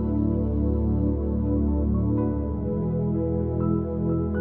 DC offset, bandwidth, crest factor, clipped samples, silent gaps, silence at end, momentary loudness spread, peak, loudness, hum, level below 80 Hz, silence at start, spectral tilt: 0.5%; 2.1 kHz; 12 dB; under 0.1%; none; 0 s; 2 LU; -12 dBFS; -25 LUFS; none; -30 dBFS; 0 s; -13 dB/octave